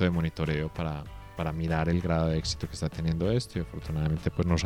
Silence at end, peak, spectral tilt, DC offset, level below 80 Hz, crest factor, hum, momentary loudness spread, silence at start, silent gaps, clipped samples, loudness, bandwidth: 0 s; -12 dBFS; -6.5 dB/octave; under 0.1%; -40 dBFS; 16 dB; none; 8 LU; 0 s; none; under 0.1%; -30 LUFS; 12 kHz